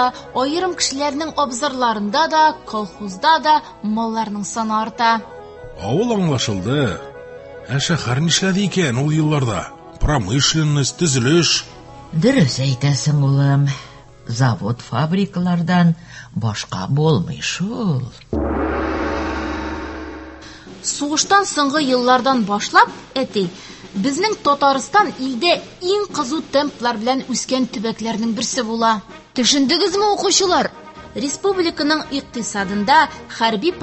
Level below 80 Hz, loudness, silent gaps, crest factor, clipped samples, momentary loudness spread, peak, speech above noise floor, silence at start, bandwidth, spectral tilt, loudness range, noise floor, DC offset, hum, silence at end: -38 dBFS; -18 LUFS; none; 18 dB; under 0.1%; 12 LU; 0 dBFS; 19 dB; 0 s; 8.6 kHz; -4.5 dB/octave; 4 LU; -37 dBFS; under 0.1%; none; 0 s